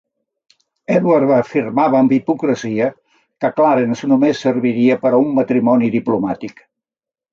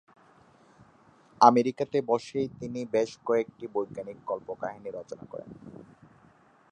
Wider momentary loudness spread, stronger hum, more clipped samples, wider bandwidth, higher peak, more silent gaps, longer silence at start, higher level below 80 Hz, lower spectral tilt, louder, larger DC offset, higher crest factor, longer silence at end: second, 8 LU vs 22 LU; neither; neither; second, 7.2 kHz vs 9.6 kHz; about the same, -2 dBFS vs -4 dBFS; neither; second, 0.9 s vs 1.4 s; first, -62 dBFS vs -70 dBFS; first, -7.5 dB/octave vs -6 dB/octave; first, -15 LUFS vs -28 LUFS; neither; second, 14 dB vs 26 dB; about the same, 0.8 s vs 0.9 s